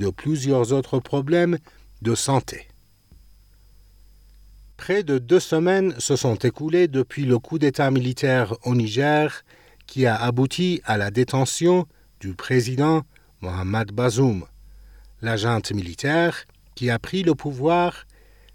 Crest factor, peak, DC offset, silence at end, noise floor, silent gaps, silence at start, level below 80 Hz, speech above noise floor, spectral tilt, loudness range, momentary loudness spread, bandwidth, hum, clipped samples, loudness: 16 dB; -6 dBFS; under 0.1%; 0.5 s; -52 dBFS; none; 0 s; -52 dBFS; 31 dB; -5.5 dB/octave; 5 LU; 10 LU; 16.5 kHz; none; under 0.1%; -22 LUFS